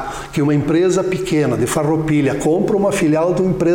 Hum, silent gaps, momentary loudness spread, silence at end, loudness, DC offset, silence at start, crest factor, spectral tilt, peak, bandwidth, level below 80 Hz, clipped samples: none; none; 3 LU; 0 s; -16 LUFS; under 0.1%; 0 s; 8 dB; -6.5 dB/octave; -6 dBFS; 17 kHz; -40 dBFS; under 0.1%